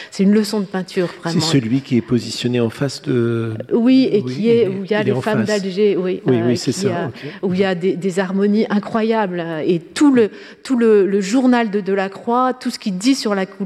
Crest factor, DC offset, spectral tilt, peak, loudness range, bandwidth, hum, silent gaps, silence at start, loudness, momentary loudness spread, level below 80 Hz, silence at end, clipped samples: 14 dB; under 0.1%; -6 dB/octave; -4 dBFS; 2 LU; 13.5 kHz; none; none; 0 s; -17 LUFS; 8 LU; -62 dBFS; 0 s; under 0.1%